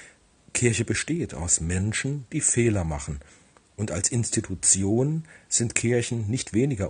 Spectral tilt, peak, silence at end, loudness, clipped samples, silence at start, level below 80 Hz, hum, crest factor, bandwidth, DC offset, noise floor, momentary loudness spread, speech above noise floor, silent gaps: -4 dB/octave; -2 dBFS; 0 s; -24 LUFS; under 0.1%; 0 s; -46 dBFS; none; 24 dB; 10 kHz; under 0.1%; -55 dBFS; 10 LU; 30 dB; none